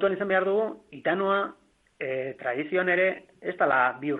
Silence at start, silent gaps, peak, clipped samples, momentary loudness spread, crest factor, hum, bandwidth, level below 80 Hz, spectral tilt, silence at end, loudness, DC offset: 0 s; none; -10 dBFS; under 0.1%; 11 LU; 18 dB; none; 4.1 kHz; -72 dBFS; -7.5 dB/octave; 0 s; -27 LUFS; under 0.1%